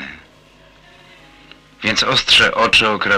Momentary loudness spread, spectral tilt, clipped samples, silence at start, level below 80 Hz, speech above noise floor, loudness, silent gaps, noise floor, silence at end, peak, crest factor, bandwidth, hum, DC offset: 11 LU; -2 dB/octave; under 0.1%; 0 s; -44 dBFS; 33 dB; -12 LUFS; none; -47 dBFS; 0 s; -2 dBFS; 16 dB; 15.5 kHz; 50 Hz at -55 dBFS; under 0.1%